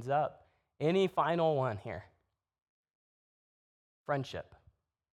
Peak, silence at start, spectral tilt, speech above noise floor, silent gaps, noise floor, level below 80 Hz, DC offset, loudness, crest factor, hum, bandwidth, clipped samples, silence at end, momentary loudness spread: -16 dBFS; 0 s; -7 dB/octave; 37 dB; 2.62-2.84 s, 2.95-4.05 s; -70 dBFS; -72 dBFS; under 0.1%; -33 LUFS; 20 dB; none; 11.5 kHz; under 0.1%; 0.75 s; 16 LU